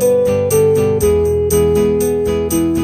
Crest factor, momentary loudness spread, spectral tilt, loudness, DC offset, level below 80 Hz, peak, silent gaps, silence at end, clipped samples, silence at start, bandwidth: 10 dB; 3 LU; -6 dB/octave; -14 LUFS; under 0.1%; -30 dBFS; -2 dBFS; none; 0 s; under 0.1%; 0 s; 15.5 kHz